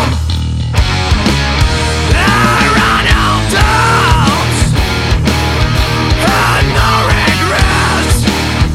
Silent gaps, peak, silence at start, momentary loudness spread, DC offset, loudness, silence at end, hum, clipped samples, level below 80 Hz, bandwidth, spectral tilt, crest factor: none; 0 dBFS; 0 s; 4 LU; under 0.1%; -10 LUFS; 0 s; none; under 0.1%; -16 dBFS; 16 kHz; -4.5 dB/octave; 10 dB